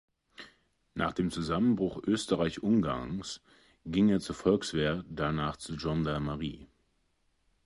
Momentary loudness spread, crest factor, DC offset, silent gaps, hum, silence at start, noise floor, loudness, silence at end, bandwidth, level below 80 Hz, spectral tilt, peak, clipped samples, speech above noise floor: 15 LU; 18 dB; under 0.1%; none; none; 0.4 s; -74 dBFS; -31 LUFS; 1 s; 11.5 kHz; -52 dBFS; -6 dB/octave; -14 dBFS; under 0.1%; 44 dB